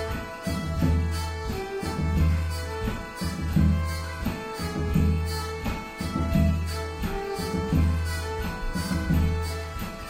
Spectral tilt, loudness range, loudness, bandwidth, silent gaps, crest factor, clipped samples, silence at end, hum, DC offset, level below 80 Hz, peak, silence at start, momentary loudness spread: -6.5 dB/octave; 1 LU; -28 LUFS; 16 kHz; none; 16 dB; under 0.1%; 0 s; none; under 0.1%; -32 dBFS; -10 dBFS; 0 s; 8 LU